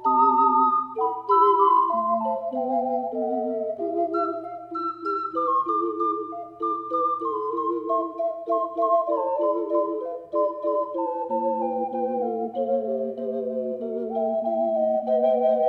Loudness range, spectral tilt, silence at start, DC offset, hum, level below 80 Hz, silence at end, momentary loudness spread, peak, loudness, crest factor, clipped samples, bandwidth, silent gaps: 4 LU; -8.5 dB/octave; 0 s; under 0.1%; none; -76 dBFS; 0 s; 10 LU; -8 dBFS; -24 LUFS; 16 dB; under 0.1%; 5.4 kHz; none